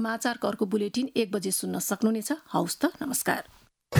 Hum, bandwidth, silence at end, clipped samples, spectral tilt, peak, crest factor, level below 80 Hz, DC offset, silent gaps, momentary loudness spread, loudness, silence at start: none; over 20 kHz; 0 s; under 0.1%; -4.5 dB/octave; -10 dBFS; 20 dB; -68 dBFS; under 0.1%; none; 3 LU; -28 LUFS; 0 s